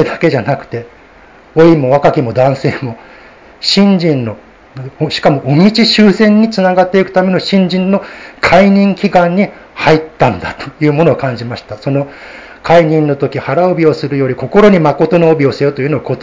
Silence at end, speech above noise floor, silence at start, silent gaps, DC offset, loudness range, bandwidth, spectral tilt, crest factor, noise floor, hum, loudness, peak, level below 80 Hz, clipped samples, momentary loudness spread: 0 s; 29 dB; 0 s; none; under 0.1%; 4 LU; 7.6 kHz; -7 dB/octave; 10 dB; -39 dBFS; none; -10 LUFS; 0 dBFS; -42 dBFS; 1%; 14 LU